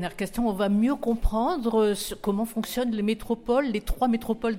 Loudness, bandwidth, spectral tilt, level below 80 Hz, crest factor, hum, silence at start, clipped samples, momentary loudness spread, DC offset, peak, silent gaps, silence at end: -26 LUFS; 16.5 kHz; -5.5 dB/octave; -36 dBFS; 14 dB; none; 0 s; under 0.1%; 5 LU; under 0.1%; -12 dBFS; none; 0 s